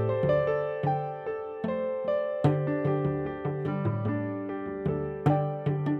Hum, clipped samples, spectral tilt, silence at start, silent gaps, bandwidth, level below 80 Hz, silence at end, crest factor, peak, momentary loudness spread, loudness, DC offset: none; under 0.1%; -10 dB/octave; 0 s; none; 4.7 kHz; -56 dBFS; 0 s; 18 dB; -10 dBFS; 7 LU; -29 LUFS; under 0.1%